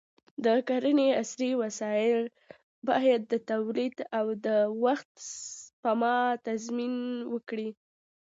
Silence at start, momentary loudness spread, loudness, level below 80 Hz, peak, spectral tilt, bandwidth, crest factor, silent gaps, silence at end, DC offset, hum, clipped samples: 0.4 s; 13 LU; -29 LUFS; -82 dBFS; -12 dBFS; -4 dB/octave; 8 kHz; 16 dB; 2.63-2.82 s, 5.05-5.15 s, 5.73-5.83 s; 0.55 s; under 0.1%; none; under 0.1%